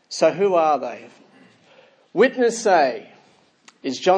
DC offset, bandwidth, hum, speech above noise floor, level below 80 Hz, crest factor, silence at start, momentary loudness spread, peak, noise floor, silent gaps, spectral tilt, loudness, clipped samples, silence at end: under 0.1%; 10.5 kHz; none; 37 dB; -80 dBFS; 18 dB; 0.1 s; 15 LU; -4 dBFS; -56 dBFS; none; -4 dB/octave; -19 LUFS; under 0.1%; 0 s